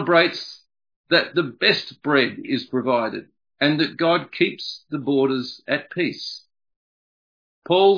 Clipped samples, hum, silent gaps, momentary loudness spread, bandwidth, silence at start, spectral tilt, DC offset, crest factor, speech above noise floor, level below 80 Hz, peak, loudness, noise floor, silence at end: under 0.1%; none; 0.96-1.04 s, 6.76-7.62 s; 12 LU; 5.2 kHz; 0 s; -6 dB/octave; under 0.1%; 20 dB; over 69 dB; -72 dBFS; -2 dBFS; -22 LUFS; under -90 dBFS; 0 s